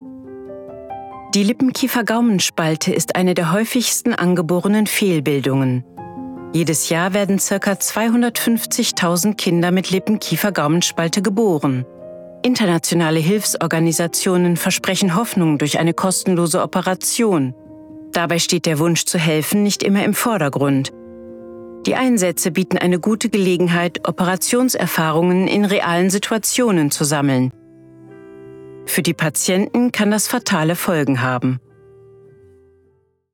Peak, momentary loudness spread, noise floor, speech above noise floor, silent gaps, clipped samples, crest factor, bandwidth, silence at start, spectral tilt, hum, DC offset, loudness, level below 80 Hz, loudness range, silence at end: -4 dBFS; 9 LU; -59 dBFS; 42 dB; none; under 0.1%; 14 dB; 20 kHz; 0 s; -4.5 dB/octave; none; under 0.1%; -17 LUFS; -60 dBFS; 2 LU; 1.75 s